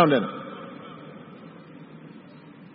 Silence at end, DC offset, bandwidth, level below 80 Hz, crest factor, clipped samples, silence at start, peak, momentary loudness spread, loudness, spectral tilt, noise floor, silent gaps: 0.55 s; under 0.1%; 5.2 kHz; -72 dBFS; 24 dB; under 0.1%; 0 s; -4 dBFS; 20 LU; -29 LUFS; -10.5 dB/octave; -47 dBFS; none